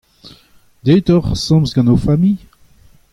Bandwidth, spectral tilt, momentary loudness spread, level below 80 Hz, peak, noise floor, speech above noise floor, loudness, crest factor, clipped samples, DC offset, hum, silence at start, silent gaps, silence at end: 12 kHz; -7.5 dB/octave; 6 LU; -34 dBFS; -2 dBFS; -49 dBFS; 36 dB; -14 LUFS; 14 dB; under 0.1%; under 0.1%; none; 0.25 s; none; 0.75 s